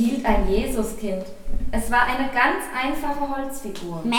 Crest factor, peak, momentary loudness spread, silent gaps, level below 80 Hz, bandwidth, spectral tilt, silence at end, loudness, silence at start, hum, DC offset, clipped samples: 18 dB; -4 dBFS; 12 LU; none; -32 dBFS; 18 kHz; -4.5 dB/octave; 0 s; -24 LUFS; 0 s; none; under 0.1%; under 0.1%